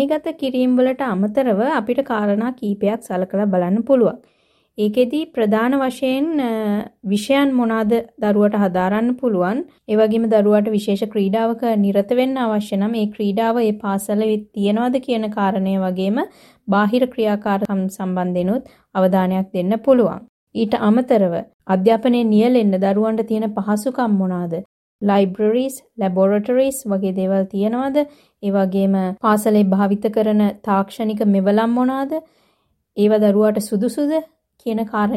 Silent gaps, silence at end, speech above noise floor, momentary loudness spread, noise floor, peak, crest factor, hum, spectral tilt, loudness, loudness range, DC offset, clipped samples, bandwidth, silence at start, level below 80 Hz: 20.29-20.47 s, 21.54-21.59 s, 24.65-24.99 s; 0 s; 47 dB; 7 LU; -65 dBFS; -2 dBFS; 16 dB; none; -7 dB/octave; -18 LUFS; 2 LU; under 0.1%; under 0.1%; 14 kHz; 0 s; -60 dBFS